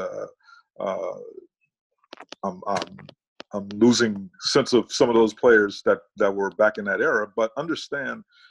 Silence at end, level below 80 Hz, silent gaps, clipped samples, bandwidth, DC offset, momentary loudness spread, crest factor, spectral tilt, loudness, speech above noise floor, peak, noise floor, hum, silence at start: 0.3 s; -62 dBFS; 1.81-1.90 s, 3.28-3.36 s; under 0.1%; 11.5 kHz; under 0.1%; 17 LU; 18 dB; -4 dB/octave; -23 LUFS; 31 dB; -4 dBFS; -54 dBFS; none; 0 s